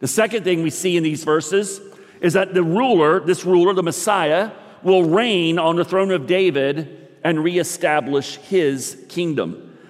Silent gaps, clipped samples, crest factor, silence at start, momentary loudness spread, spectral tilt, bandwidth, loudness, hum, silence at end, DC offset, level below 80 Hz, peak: none; under 0.1%; 14 dB; 0 s; 9 LU; -4.5 dB/octave; 15.5 kHz; -19 LUFS; none; 0.2 s; under 0.1%; -70 dBFS; -4 dBFS